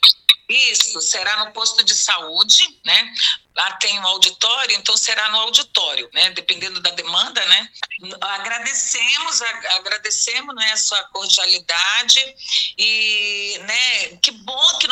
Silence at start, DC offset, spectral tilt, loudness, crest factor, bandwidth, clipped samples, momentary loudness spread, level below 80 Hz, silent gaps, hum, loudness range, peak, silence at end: 0 s; under 0.1%; 3 dB/octave; -15 LUFS; 18 dB; 19 kHz; under 0.1%; 7 LU; -68 dBFS; none; none; 3 LU; 0 dBFS; 0 s